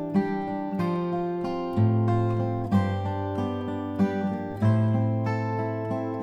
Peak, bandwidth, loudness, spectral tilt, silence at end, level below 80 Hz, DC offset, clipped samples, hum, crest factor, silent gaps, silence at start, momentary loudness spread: -10 dBFS; 6 kHz; -27 LUFS; -9.5 dB/octave; 0 s; -54 dBFS; under 0.1%; under 0.1%; none; 16 dB; none; 0 s; 6 LU